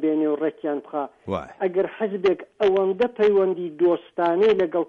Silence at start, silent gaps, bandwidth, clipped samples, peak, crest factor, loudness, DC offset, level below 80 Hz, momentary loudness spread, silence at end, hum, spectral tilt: 0 s; none; 6.6 kHz; under 0.1%; -10 dBFS; 12 dB; -23 LUFS; under 0.1%; -62 dBFS; 10 LU; 0.05 s; none; -7.5 dB/octave